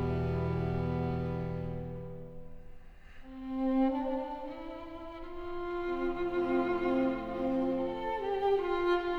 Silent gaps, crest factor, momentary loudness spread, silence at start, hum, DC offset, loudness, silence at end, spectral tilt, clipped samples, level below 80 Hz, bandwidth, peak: none; 14 dB; 15 LU; 0 s; none; under 0.1%; -33 LUFS; 0 s; -9 dB/octave; under 0.1%; -48 dBFS; 6.4 kHz; -18 dBFS